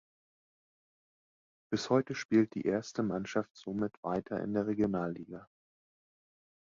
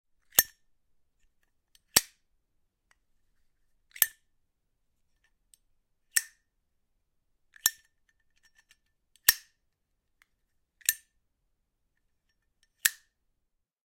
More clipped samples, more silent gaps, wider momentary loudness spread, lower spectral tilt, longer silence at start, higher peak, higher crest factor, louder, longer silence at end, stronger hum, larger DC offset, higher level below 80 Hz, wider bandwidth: neither; first, 2.25-2.29 s, 3.51-3.55 s, 3.97-4.03 s vs none; second, 10 LU vs 13 LU; first, -6.5 dB/octave vs 1.5 dB/octave; first, 1.7 s vs 0.35 s; second, -14 dBFS vs 0 dBFS; second, 22 dB vs 36 dB; second, -34 LUFS vs -28 LUFS; about the same, 1.2 s vs 1.1 s; neither; neither; about the same, -68 dBFS vs -68 dBFS; second, 7.6 kHz vs 16.5 kHz